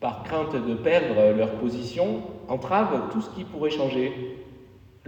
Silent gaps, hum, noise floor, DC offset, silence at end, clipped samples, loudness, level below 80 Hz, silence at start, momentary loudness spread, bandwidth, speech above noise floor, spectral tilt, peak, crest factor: none; none; -50 dBFS; under 0.1%; 0.4 s; under 0.1%; -25 LUFS; -56 dBFS; 0 s; 12 LU; 8.2 kHz; 25 dB; -7 dB/octave; -8 dBFS; 16 dB